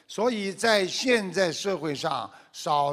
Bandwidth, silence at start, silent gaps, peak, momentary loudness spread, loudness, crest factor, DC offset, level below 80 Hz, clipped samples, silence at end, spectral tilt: 15.5 kHz; 0.1 s; none; -6 dBFS; 9 LU; -26 LUFS; 20 dB; under 0.1%; -68 dBFS; under 0.1%; 0 s; -3.5 dB/octave